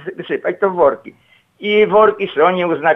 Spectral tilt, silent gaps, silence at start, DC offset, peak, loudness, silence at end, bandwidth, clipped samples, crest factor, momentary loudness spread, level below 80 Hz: -7.5 dB/octave; none; 0 s; under 0.1%; -2 dBFS; -15 LUFS; 0 s; 4 kHz; under 0.1%; 14 dB; 11 LU; -58 dBFS